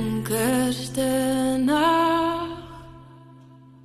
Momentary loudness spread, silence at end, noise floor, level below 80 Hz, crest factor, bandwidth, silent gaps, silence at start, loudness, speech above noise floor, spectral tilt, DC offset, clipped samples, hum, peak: 16 LU; 0.5 s; -48 dBFS; -50 dBFS; 14 dB; 13 kHz; none; 0 s; -22 LUFS; 26 dB; -4.5 dB/octave; under 0.1%; under 0.1%; none; -10 dBFS